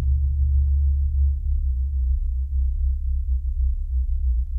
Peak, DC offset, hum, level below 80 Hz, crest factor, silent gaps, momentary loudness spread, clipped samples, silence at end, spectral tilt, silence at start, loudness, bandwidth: -12 dBFS; under 0.1%; none; -20 dBFS; 10 dB; none; 5 LU; under 0.1%; 0 s; -11.5 dB/octave; 0 s; -24 LUFS; 0.3 kHz